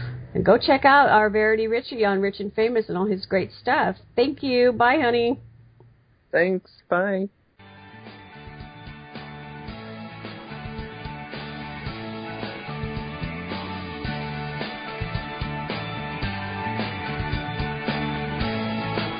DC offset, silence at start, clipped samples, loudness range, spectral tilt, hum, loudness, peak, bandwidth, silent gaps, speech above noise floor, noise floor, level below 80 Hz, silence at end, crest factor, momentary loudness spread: under 0.1%; 0 s; under 0.1%; 16 LU; -10.5 dB/octave; none; -24 LUFS; -4 dBFS; 5.2 kHz; none; 36 dB; -56 dBFS; -44 dBFS; 0 s; 20 dB; 19 LU